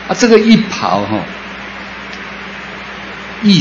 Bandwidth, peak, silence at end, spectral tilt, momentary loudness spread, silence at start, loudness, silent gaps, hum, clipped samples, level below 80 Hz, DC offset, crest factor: 7.6 kHz; 0 dBFS; 0 s; -5 dB/octave; 17 LU; 0 s; -12 LUFS; none; none; 0.2%; -44 dBFS; under 0.1%; 14 dB